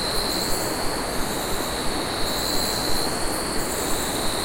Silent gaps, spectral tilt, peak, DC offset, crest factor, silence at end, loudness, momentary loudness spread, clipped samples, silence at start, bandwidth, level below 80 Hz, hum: none; -2.5 dB/octave; -10 dBFS; under 0.1%; 14 dB; 0 s; -24 LUFS; 3 LU; under 0.1%; 0 s; 16.5 kHz; -36 dBFS; none